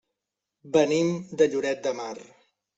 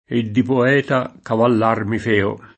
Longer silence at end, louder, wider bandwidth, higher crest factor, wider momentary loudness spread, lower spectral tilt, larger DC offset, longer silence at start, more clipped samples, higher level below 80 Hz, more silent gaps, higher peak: first, 0.55 s vs 0.1 s; second, -25 LUFS vs -18 LUFS; about the same, 8 kHz vs 8.6 kHz; about the same, 20 dB vs 16 dB; first, 13 LU vs 5 LU; second, -5 dB/octave vs -7.5 dB/octave; neither; first, 0.65 s vs 0.1 s; neither; second, -70 dBFS vs -56 dBFS; neither; second, -8 dBFS vs 0 dBFS